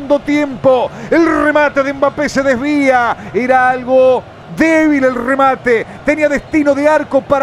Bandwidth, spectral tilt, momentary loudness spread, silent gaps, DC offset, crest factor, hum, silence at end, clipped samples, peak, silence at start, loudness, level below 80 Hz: 12 kHz; -5.5 dB/octave; 4 LU; none; under 0.1%; 12 dB; none; 0 s; under 0.1%; 0 dBFS; 0 s; -12 LUFS; -42 dBFS